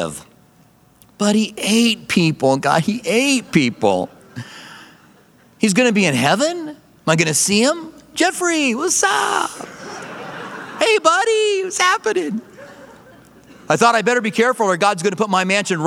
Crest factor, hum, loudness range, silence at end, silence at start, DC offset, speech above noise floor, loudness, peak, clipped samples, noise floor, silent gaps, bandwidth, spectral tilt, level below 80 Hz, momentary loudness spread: 18 dB; none; 2 LU; 0 s; 0 s; under 0.1%; 35 dB; -16 LUFS; 0 dBFS; under 0.1%; -52 dBFS; none; 17 kHz; -3.5 dB/octave; -60 dBFS; 17 LU